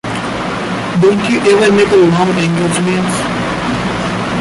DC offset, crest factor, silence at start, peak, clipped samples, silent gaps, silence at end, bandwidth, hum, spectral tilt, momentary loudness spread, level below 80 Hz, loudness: under 0.1%; 12 dB; 0.05 s; -2 dBFS; under 0.1%; none; 0 s; 11.5 kHz; none; -5.5 dB/octave; 9 LU; -38 dBFS; -12 LUFS